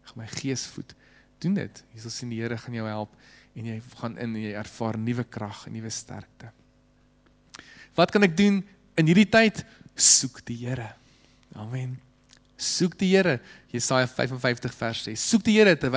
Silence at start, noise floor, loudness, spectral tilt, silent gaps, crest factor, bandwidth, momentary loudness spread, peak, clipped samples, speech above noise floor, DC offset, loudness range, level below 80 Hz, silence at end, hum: 0.05 s; -61 dBFS; -24 LUFS; -4 dB/octave; none; 20 dB; 8 kHz; 20 LU; -6 dBFS; under 0.1%; 36 dB; under 0.1%; 13 LU; -58 dBFS; 0 s; 50 Hz at -60 dBFS